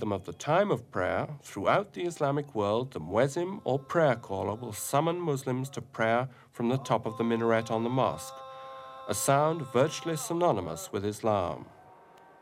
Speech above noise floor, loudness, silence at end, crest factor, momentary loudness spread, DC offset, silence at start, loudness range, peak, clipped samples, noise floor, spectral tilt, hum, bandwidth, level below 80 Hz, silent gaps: 26 dB; -30 LUFS; 0.55 s; 18 dB; 9 LU; under 0.1%; 0 s; 1 LU; -10 dBFS; under 0.1%; -55 dBFS; -5.5 dB/octave; none; 16 kHz; -66 dBFS; none